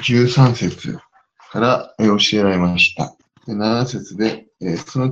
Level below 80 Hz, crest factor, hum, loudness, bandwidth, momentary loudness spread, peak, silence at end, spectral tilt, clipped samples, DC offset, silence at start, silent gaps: -52 dBFS; 18 dB; none; -17 LUFS; 7.8 kHz; 14 LU; 0 dBFS; 0 s; -5.5 dB/octave; under 0.1%; under 0.1%; 0 s; none